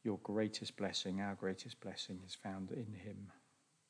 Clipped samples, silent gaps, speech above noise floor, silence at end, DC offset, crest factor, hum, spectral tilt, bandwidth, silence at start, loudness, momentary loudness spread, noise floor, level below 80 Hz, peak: under 0.1%; none; 32 dB; 0.5 s; under 0.1%; 18 dB; none; -4.5 dB/octave; 10.5 kHz; 0.05 s; -44 LUFS; 11 LU; -76 dBFS; -84 dBFS; -26 dBFS